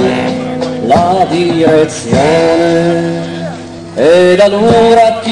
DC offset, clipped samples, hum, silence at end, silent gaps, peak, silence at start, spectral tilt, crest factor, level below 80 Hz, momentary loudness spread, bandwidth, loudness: under 0.1%; under 0.1%; none; 0 s; none; 0 dBFS; 0 s; -5.5 dB/octave; 10 dB; -38 dBFS; 12 LU; 11.5 kHz; -9 LUFS